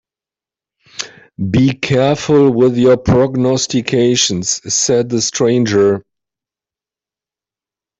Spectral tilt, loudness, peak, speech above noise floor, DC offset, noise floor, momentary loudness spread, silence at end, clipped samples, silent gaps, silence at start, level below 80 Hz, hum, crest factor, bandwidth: -4.5 dB/octave; -13 LUFS; -2 dBFS; 77 dB; under 0.1%; -89 dBFS; 12 LU; 2 s; under 0.1%; none; 1 s; -44 dBFS; none; 14 dB; 8.4 kHz